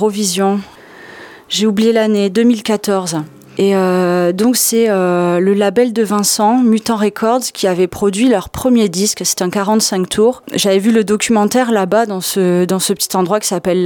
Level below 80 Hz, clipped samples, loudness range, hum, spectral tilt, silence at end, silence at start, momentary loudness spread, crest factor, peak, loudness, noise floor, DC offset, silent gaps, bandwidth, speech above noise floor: -50 dBFS; under 0.1%; 2 LU; none; -4 dB/octave; 0 s; 0 s; 4 LU; 12 dB; 0 dBFS; -13 LUFS; -36 dBFS; under 0.1%; none; 19 kHz; 22 dB